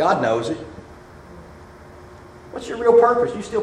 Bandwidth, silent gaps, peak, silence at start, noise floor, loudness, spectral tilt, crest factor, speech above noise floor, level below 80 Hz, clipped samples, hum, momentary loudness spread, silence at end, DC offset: 10 kHz; none; -2 dBFS; 0 s; -42 dBFS; -19 LUFS; -5.5 dB/octave; 20 dB; 24 dB; -50 dBFS; under 0.1%; none; 27 LU; 0 s; under 0.1%